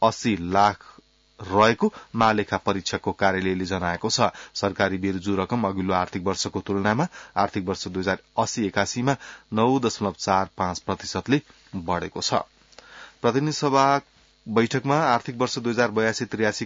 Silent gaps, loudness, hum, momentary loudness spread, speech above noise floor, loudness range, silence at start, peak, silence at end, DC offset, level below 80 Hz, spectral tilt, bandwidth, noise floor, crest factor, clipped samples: none; -24 LUFS; none; 7 LU; 23 dB; 3 LU; 0 s; -6 dBFS; 0 s; under 0.1%; -58 dBFS; -4.5 dB/octave; 7.8 kHz; -47 dBFS; 18 dB; under 0.1%